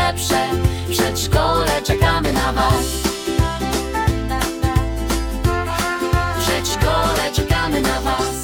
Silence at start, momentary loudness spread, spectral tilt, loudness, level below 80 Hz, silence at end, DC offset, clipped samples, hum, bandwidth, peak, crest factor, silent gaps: 0 s; 4 LU; -4.5 dB/octave; -19 LUFS; -26 dBFS; 0 s; under 0.1%; under 0.1%; none; 18 kHz; -2 dBFS; 16 dB; none